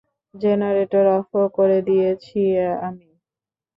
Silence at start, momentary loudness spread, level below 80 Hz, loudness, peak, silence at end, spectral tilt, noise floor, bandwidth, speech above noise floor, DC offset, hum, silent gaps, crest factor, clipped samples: 0.35 s; 7 LU; -62 dBFS; -19 LUFS; -6 dBFS; 0.8 s; -10 dB/octave; under -90 dBFS; 5.4 kHz; over 71 dB; under 0.1%; none; none; 14 dB; under 0.1%